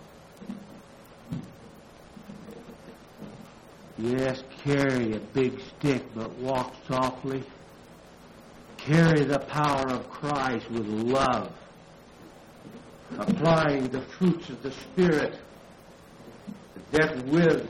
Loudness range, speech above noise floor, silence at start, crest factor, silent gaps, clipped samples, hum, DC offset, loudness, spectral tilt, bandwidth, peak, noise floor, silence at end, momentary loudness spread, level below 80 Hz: 9 LU; 24 dB; 0 s; 18 dB; none; under 0.1%; none; under 0.1%; -27 LUFS; -6.5 dB/octave; 12.5 kHz; -10 dBFS; -50 dBFS; 0 s; 25 LU; -54 dBFS